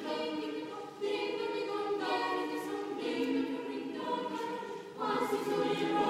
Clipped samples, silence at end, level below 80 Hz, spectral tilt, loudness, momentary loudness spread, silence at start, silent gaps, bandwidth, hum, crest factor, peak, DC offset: under 0.1%; 0 s; -78 dBFS; -4.5 dB/octave; -35 LUFS; 7 LU; 0 s; none; 15.5 kHz; none; 16 dB; -18 dBFS; under 0.1%